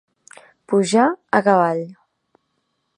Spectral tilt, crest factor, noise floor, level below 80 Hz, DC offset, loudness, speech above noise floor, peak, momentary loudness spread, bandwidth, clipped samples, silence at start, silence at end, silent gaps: -5.5 dB/octave; 20 dB; -71 dBFS; -72 dBFS; under 0.1%; -18 LUFS; 54 dB; -2 dBFS; 9 LU; 11 kHz; under 0.1%; 0.7 s; 1.05 s; none